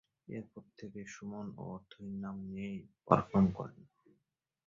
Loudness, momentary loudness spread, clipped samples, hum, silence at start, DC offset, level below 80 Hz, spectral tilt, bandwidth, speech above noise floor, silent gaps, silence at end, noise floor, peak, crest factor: -37 LUFS; 17 LU; under 0.1%; none; 0.3 s; under 0.1%; -62 dBFS; -8 dB/octave; 7.4 kHz; 46 dB; none; 0.85 s; -83 dBFS; -10 dBFS; 28 dB